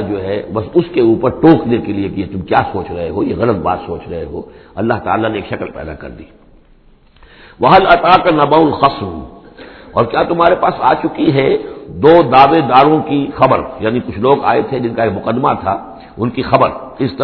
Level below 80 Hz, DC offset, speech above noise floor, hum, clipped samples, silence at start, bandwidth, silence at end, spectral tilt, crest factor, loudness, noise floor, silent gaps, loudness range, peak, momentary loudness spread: -40 dBFS; under 0.1%; 33 dB; none; 0.3%; 0 s; 5.4 kHz; 0 s; -9.5 dB/octave; 14 dB; -13 LUFS; -46 dBFS; none; 8 LU; 0 dBFS; 15 LU